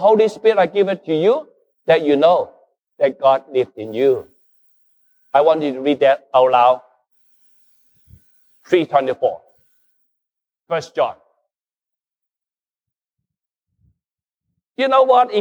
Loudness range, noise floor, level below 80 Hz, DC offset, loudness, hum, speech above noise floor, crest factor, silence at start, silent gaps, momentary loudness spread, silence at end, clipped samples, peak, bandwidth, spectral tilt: 12 LU; under -90 dBFS; -68 dBFS; under 0.1%; -17 LUFS; none; over 75 dB; 18 dB; 0 s; none; 10 LU; 0 s; under 0.1%; -2 dBFS; over 20 kHz; -6 dB/octave